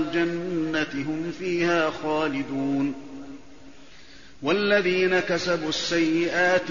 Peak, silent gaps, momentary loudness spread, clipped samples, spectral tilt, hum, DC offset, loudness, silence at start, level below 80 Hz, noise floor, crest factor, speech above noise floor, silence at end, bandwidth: -10 dBFS; none; 10 LU; under 0.1%; -3 dB/octave; none; 0.6%; -24 LUFS; 0 s; -58 dBFS; -49 dBFS; 16 dB; 25 dB; 0 s; 7.2 kHz